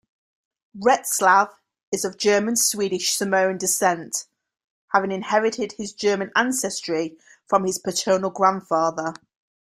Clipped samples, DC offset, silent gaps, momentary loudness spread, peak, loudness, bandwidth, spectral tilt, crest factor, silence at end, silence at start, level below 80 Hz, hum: under 0.1%; under 0.1%; 1.83-1.92 s, 4.64-4.88 s; 10 LU; -2 dBFS; -22 LUFS; 16 kHz; -2.5 dB/octave; 20 dB; 0.55 s; 0.75 s; -68 dBFS; none